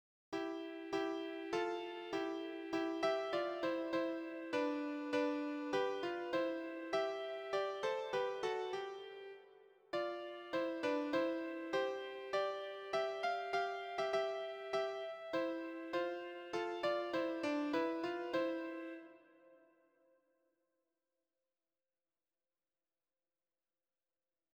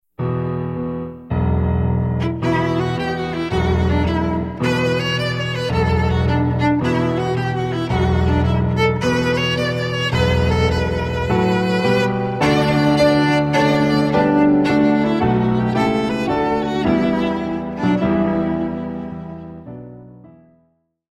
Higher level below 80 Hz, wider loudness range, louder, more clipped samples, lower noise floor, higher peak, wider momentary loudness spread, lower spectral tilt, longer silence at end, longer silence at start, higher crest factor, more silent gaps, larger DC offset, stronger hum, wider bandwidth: second, -82 dBFS vs -32 dBFS; about the same, 3 LU vs 5 LU; second, -40 LUFS vs -18 LUFS; neither; first, under -90 dBFS vs -63 dBFS; second, -24 dBFS vs -4 dBFS; about the same, 7 LU vs 8 LU; second, -4.5 dB/octave vs -7 dB/octave; first, 5 s vs 1 s; about the same, 0.3 s vs 0.2 s; about the same, 18 dB vs 14 dB; neither; neither; neither; first, 19.5 kHz vs 13 kHz